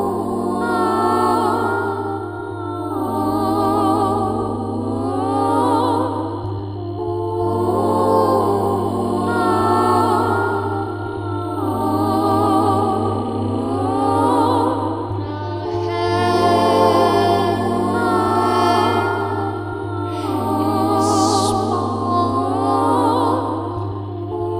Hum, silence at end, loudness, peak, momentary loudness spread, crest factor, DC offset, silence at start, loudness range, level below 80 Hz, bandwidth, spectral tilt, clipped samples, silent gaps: none; 0 s; -18 LUFS; -2 dBFS; 9 LU; 16 dB; under 0.1%; 0 s; 3 LU; -48 dBFS; 16 kHz; -6.5 dB/octave; under 0.1%; none